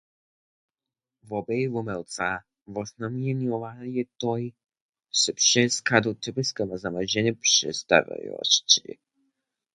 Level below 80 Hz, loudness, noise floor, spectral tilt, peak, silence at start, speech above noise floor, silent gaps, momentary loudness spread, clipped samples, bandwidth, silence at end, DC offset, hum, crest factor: -64 dBFS; -24 LUFS; -90 dBFS; -2.5 dB/octave; -2 dBFS; 1.25 s; 64 dB; 4.81-4.93 s; 15 LU; under 0.1%; 11.5 kHz; 0.95 s; under 0.1%; none; 26 dB